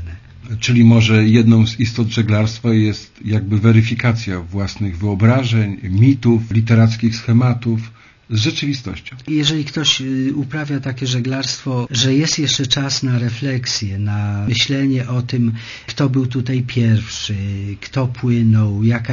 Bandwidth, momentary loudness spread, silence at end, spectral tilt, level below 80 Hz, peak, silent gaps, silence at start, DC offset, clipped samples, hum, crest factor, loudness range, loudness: 7.4 kHz; 10 LU; 0 s; -5.5 dB/octave; -44 dBFS; 0 dBFS; none; 0 s; under 0.1%; under 0.1%; none; 16 dB; 5 LU; -16 LUFS